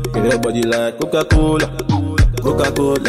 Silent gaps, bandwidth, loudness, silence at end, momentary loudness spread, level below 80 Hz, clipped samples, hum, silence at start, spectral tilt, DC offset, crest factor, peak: none; 16 kHz; -16 LUFS; 0 s; 4 LU; -22 dBFS; under 0.1%; none; 0 s; -6 dB/octave; under 0.1%; 10 dB; -4 dBFS